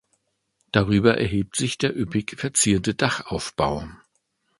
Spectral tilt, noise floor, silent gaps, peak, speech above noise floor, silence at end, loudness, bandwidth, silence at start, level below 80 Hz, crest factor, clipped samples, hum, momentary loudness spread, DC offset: -4.5 dB/octave; -72 dBFS; none; 0 dBFS; 50 dB; 0.65 s; -23 LUFS; 11.5 kHz; 0.75 s; -44 dBFS; 24 dB; under 0.1%; none; 8 LU; under 0.1%